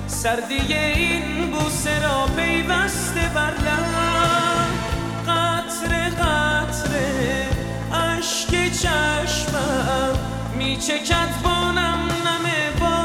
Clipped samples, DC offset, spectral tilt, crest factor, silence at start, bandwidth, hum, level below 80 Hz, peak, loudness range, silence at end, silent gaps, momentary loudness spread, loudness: under 0.1%; under 0.1%; -4 dB/octave; 14 dB; 0 s; 17.5 kHz; none; -32 dBFS; -6 dBFS; 1 LU; 0 s; none; 5 LU; -21 LUFS